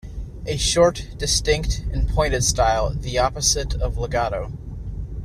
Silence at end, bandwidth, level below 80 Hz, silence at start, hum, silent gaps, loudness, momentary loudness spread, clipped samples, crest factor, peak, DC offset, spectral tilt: 0 s; 14.5 kHz; -28 dBFS; 0.05 s; none; none; -21 LUFS; 15 LU; under 0.1%; 18 dB; -4 dBFS; under 0.1%; -3.5 dB/octave